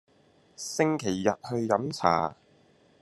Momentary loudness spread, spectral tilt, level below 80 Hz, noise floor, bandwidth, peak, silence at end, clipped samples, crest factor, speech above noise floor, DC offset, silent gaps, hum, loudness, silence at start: 9 LU; -5 dB/octave; -68 dBFS; -62 dBFS; 13 kHz; -6 dBFS; 0.7 s; under 0.1%; 24 dB; 35 dB; under 0.1%; none; none; -28 LUFS; 0.6 s